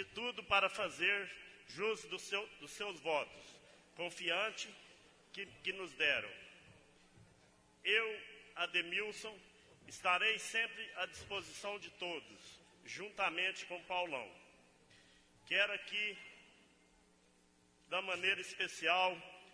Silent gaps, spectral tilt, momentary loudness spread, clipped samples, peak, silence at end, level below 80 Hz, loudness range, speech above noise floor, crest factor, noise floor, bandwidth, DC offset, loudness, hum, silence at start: none; -1.5 dB/octave; 19 LU; under 0.1%; -20 dBFS; 0 s; -76 dBFS; 4 LU; 31 dB; 22 dB; -71 dBFS; 11 kHz; under 0.1%; -38 LUFS; none; 0 s